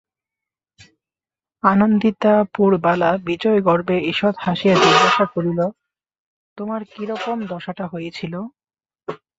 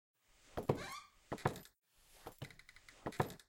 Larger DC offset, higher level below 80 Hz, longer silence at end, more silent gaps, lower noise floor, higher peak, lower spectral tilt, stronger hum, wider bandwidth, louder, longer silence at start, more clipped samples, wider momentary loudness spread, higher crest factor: neither; first, -58 dBFS vs -66 dBFS; first, 0.25 s vs 0.05 s; first, 6.20-6.56 s vs none; first, under -90 dBFS vs -62 dBFS; first, 0 dBFS vs -16 dBFS; about the same, -6 dB/octave vs -6 dB/octave; neither; second, 8 kHz vs 16.5 kHz; first, -18 LUFS vs -45 LUFS; first, 1.65 s vs 0.45 s; neither; second, 15 LU vs 18 LU; second, 20 dB vs 28 dB